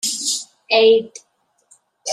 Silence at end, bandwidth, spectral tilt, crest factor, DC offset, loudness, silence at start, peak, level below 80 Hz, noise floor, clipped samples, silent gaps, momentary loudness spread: 0 s; 14 kHz; -0.5 dB/octave; 16 dB; under 0.1%; -16 LUFS; 0.05 s; -4 dBFS; -68 dBFS; -57 dBFS; under 0.1%; none; 17 LU